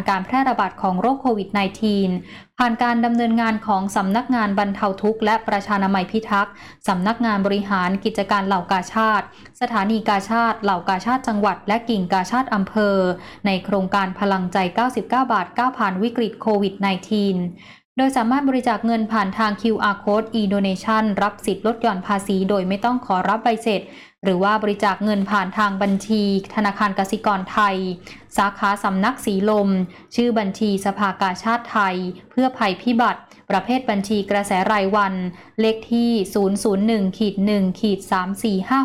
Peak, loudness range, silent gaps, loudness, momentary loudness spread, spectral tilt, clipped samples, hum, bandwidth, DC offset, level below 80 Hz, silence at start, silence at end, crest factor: -8 dBFS; 1 LU; 17.85-17.96 s; -20 LUFS; 4 LU; -6 dB/octave; under 0.1%; none; 14 kHz; 0.2%; -54 dBFS; 0 s; 0 s; 12 dB